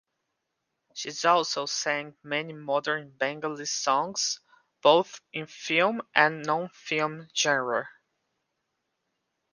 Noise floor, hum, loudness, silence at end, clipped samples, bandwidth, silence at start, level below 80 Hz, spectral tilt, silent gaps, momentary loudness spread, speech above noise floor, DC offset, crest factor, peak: -81 dBFS; none; -27 LUFS; 1.65 s; under 0.1%; 10.5 kHz; 0.95 s; -80 dBFS; -2.5 dB/octave; none; 12 LU; 54 dB; under 0.1%; 26 dB; -2 dBFS